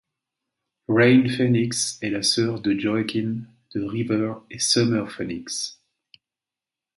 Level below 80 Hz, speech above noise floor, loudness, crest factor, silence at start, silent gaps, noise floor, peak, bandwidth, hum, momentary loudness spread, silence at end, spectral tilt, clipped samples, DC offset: -60 dBFS; 67 dB; -22 LUFS; 20 dB; 0.9 s; none; -89 dBFS; -4 dBFS; 11.5 kHz; none; 13 LU; 1.25 s; -4.5 dB/octave; under 0.1%; under 0.1%